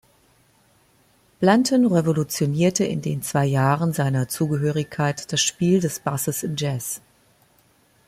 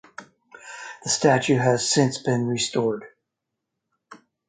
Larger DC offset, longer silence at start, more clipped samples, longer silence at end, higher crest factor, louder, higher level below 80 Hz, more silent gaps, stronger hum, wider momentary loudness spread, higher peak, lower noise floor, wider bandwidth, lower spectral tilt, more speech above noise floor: neither; first, 1.4 s vs 0.2 s; neither; first, 1.1 s vs 0.3 s; about the same, 20 dB vs 20 dB; about the same, -22 LUFS vs -22 LUFS; first, -58 dBFS vs -66 dBFS; neither; neither; second, 7 LU vs 19 LU; first, -2 dBFS vs -6 dBFS; second, -60 dBFS vs -82 dBFS; first, 16 kHz vs 9.6 kHz; about the same, -5 dB/octave vs -4 dB/octave; second, 39 dB vs 61 dB